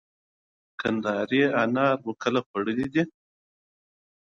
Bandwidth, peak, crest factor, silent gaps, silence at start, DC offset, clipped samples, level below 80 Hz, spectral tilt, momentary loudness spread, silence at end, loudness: 7.6 kHz; -8 dBFS; 18 dB; 2.46-2.54 s; 0.8 s; under 0.1%; under 0.1%; -64 dBFS; -6.5 dB/octave; 7 LU; 1.25 s; -26 LUFS